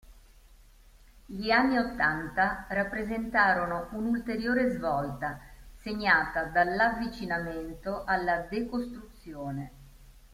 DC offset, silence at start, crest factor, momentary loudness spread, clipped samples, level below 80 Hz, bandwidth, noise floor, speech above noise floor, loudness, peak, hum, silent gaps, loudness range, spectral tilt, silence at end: under 0.1%; 0.05 s; 20 dB; 15 LU; under 0.1%; -50 dBFS; 16 kHz; -56 dBFS; 27 dB; -29 LUFS; -10 dBFS; none; none; 3 LU; -6 dB/octave; 0.1 s